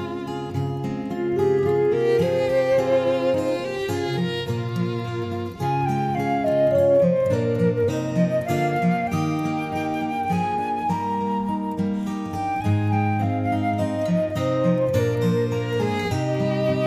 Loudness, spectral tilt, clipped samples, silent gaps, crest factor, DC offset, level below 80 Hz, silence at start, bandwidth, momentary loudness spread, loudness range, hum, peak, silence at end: -23 LUFS; -7.5 dB/octave; under 0.1%; none; 14 dB; under 0.1%; -54 dBFS; 0 s; 15.5 kHz; 7 LU; 4 LU; none; -8 dBFS; 0 s